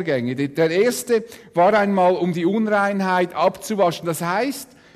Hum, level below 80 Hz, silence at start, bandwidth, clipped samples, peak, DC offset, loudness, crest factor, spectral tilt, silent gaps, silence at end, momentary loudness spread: none; -62 dBFS; 0 s; 14 kHz; under 0.1%; -6 dBFS; under 0.1%; -20 LUFS; 12 dB; -5.5 dB/octave; none; 0.3 s; 7 LU